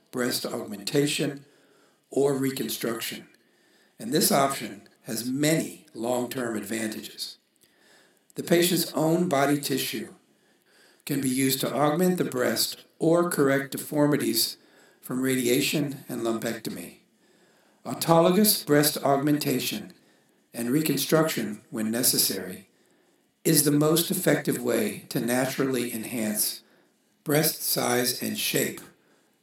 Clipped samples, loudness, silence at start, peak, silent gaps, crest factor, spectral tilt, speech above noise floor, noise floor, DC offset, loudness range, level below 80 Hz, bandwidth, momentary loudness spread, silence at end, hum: under 0.1%; -25 LUFS; 0.15 s; -4 dBFS; none; 22 dB; -4 dB/octave; 40 dB; -66 dBFS; under 0.1%; 5 LU; -76 dBFS; 18 kHz; 15 LU; 0.55 s; none